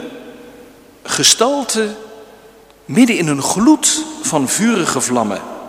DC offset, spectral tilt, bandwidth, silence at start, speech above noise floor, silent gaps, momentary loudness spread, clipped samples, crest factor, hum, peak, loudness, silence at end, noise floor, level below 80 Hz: under 0.1%; -3 dB/octave; 16 kHz; 0 s; 29 dB; none; 12 LU; under 0.1%; 16 dB; none; 0 dBFS; -14 LUFS; 0 s; -44 dBFS; -54 dBFS